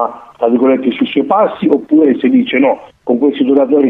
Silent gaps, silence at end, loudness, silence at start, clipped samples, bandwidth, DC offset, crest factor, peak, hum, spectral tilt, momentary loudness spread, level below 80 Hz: none; 0 s; -12 LUFS; 0 s; under 0.1%; 4 kHz; under 0.1%; 12 dB; 0 dBFS; none; -8.5 dB/octave; 6 LU; -58 dBFS